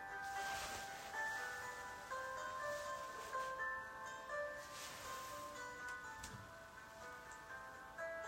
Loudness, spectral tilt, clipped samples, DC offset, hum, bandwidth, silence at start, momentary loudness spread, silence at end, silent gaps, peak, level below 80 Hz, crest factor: -47 LUFS; -2 dB/octave; under 0.1%; under 0.1%; none; 16 kHz; 0 s; 10 LU; 0 s; none; -32 dBFS; -72 dBFS; 16 dB